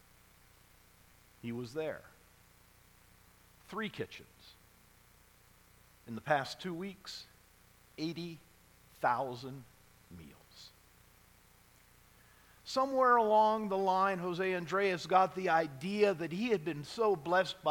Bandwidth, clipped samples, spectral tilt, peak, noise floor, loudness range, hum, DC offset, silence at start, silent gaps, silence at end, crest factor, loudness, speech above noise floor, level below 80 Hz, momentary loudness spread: 19 kHz; under 0.1%; -5.5 dB/octave; -14 dBFS; -64 dBFS; 17 LU; none; under 0.1%; 1.45 s; none; 0 s; 22 dB; -33 LUFS; 30 dB; -70 dBFS; 23 LU